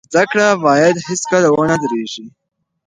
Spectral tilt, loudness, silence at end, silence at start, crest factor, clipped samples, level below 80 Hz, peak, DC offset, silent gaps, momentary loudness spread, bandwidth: -4.5 dB/octave; -14 LUFS; 0.6 s; 0.1 s; 14 dB; under 0.1%; -56 dBFS; 0 dBFS; under 0.1%; none; 10 LU; 10.5 kHz